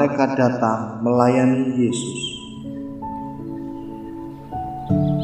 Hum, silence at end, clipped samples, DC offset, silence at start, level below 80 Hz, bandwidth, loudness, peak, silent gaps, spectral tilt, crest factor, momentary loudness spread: none; 0 s; under 0.1%; under 0.1%; 0 s; -48 dBFS; 10.5 kHz; -21 LUFS; -2 dBFS; none; -6.5 dB/octave; 20 dB; 16 LU